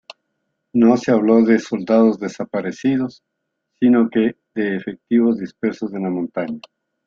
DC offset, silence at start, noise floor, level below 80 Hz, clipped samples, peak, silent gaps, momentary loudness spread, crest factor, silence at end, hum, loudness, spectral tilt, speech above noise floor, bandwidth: under 0.1%; 0.75 s; -75 dBFS; -62 dBFS; under 0.1%; -2 dBFS; none; 11 LU; 16 dB; 0.5 s; none; -18 LUFS; -7 dB/octave; 58 dB; 7.2 kHz